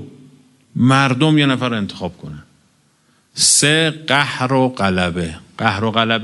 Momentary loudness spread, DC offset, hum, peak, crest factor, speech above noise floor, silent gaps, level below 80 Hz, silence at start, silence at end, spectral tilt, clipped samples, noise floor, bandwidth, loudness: 17 LU; under 0.1%; none; 0 dBFS; 18 dB; 42 dB; none; -50 dBFS; 0 s; 0 s; -3.5 dB/octave; under 0.1%; -58 dBFS; 11.5 kHz; -15 LUFS